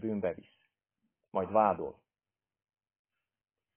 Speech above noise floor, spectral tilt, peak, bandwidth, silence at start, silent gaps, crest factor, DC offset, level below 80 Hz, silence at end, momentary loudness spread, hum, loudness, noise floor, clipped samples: over 58 dB; -7 dB/octave; -14 dBFS; 3.5 kHz; 0 s; none; 24 dB; under 0.1%; -68 dBFS; 1.85 s; 14 LU; none; -32 LUFS; under -90 dBFS; under 0.1%